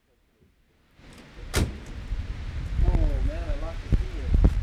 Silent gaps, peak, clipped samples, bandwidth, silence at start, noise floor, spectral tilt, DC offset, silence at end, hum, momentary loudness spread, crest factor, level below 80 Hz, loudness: none; -6 dBFS; under 0.1%; 14 kHz; 1.05 s; -63 dBFS; -6 dB/octave; under 0.1%; 0 s; none; 18 LU; 20 dB; -28 dBFS; -29 LUFS